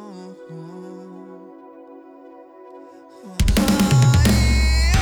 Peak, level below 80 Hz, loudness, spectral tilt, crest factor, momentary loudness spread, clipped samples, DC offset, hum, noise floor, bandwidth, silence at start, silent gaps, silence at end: -8 dBFS; -24 dBFS; -17 LUFS; -5.5 dB/octave; 12 dB; 24 LU; under 0.1%; under 0.1%; none; -43 dBFS; over 20 kHz; 0 s; none; 0 s